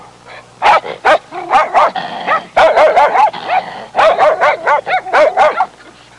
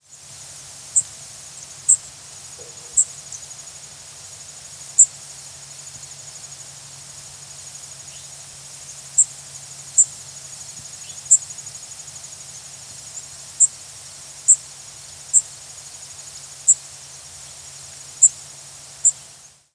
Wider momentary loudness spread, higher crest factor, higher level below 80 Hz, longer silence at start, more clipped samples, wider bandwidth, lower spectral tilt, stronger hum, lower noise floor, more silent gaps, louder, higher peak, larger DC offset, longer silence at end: second, 8 LU vs 21 LU; second, 10 dB vs 24 dB; first, -50 dBFS vs -64 dBFS; about the same, 0 s vs 0.1 s; neither; about the same, 11 kHz vs 11 kHz; first, -3 dB/octave vs 1 dB/octave; neither; second, -39 dBFS vs -46 dBFS; neither; first, -11 LUFS vs -17 LUFS; about the same, -2 dBFS vs 0 dBFS; neither; about the same, 0.3 s vs 0.2 s